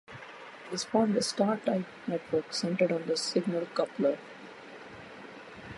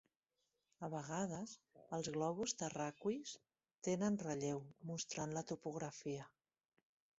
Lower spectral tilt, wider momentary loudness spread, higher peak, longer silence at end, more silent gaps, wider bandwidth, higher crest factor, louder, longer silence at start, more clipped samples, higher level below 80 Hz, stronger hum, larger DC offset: about the same, -4.5 dB/octave vs -5.5 dB/octave; first, 18 LU vs 11 LU; first, -14 dBFS vs -26 dBFS; second, 0 s vs 0.9 s; neither; first, 11.5 kHz vs 8 kHz; about the same, 18 dB vs 20 dB; first, -30 LUFS vs -44 LUFS; second, 0.1 s vs 0.8 s; neither; first, -70 dBFS vs -78 dBFS; neither; neither